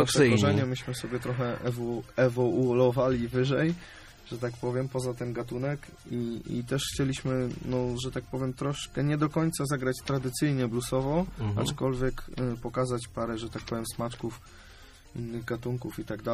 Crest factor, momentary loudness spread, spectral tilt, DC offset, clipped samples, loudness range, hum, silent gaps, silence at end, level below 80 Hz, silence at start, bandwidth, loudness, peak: 20 dB; 11 LU; -6 dB/octave; under 0.1%; under 0.1%; 6 LU; none; none; 0 s; -48 dBFS; 0 s; 15 kHz; -30 LUFS; -8 dBFS